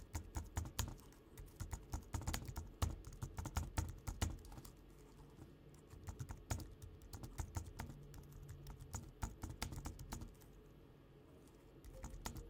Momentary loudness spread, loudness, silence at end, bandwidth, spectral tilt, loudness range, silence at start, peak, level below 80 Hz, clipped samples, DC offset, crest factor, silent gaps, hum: 17 LU; -50 LUFS; 0 s; 18 kHz; -4.5 dB/octave; 6 LU; 0 s; -22 dBFS; -54 dBFS; under 0.1%; under 0.1%; 26 dB; none; none